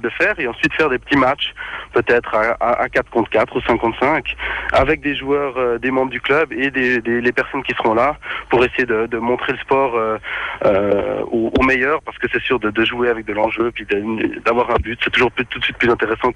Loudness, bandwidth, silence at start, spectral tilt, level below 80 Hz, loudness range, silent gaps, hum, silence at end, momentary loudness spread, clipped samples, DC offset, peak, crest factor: -17 LUFS; 10.5 kHz; 0 s; -6 dB/octave; -40 dBFS; 1 LU; none; none; 0.05 s; 5 LU; under 0.1%; under 0.1%; -4 dBFS; 14 dB